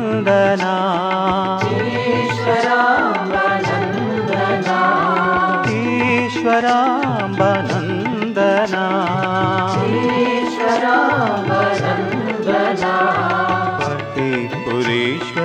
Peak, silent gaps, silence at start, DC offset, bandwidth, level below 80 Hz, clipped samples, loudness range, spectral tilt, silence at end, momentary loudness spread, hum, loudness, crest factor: 0 dBFS; none; 0 s; under 0.1%; 10 kHz; -52 dBFS; under 0.1%; 2 LU; -6 dB/octave; 0 s; 5 LU; none; -17 LUFS; 16 dB